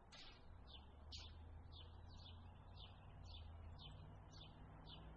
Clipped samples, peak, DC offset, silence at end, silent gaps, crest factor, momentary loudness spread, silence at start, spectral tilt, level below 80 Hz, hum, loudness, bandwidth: under 0.1%; -42 dBFS; under 0.1%; 0 s; none; 16 dB; 4 LU; 0 s; -4 dB/octave; -64 dBFS; none; -60 LUFS; 7 kHz